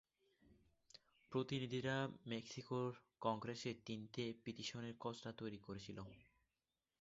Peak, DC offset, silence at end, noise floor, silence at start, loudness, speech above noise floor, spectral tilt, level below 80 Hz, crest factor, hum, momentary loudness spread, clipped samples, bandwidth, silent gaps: -26 dBFS; under 0.1%; 0.8 s; under -90 dBFS; 0.45 s; -47 LUFS; over 43 dB; -4.5 dB/octave; -78 dBFS; 22 dB; none; 12 LU; under 0.1%; 7.6 kHz; none